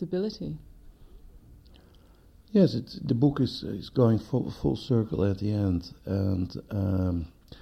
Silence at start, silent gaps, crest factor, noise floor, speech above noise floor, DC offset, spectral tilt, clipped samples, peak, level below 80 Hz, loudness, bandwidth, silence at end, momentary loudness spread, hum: 0 s; none; 18 dB; -55 dBFS; 29 dB; under 0.1%; -9 dB/octave; under 0.1%; -10 dBFS; -48 dBFS; -28 LUFS; 13.5 kHz; 0.05 s; 10 LU; none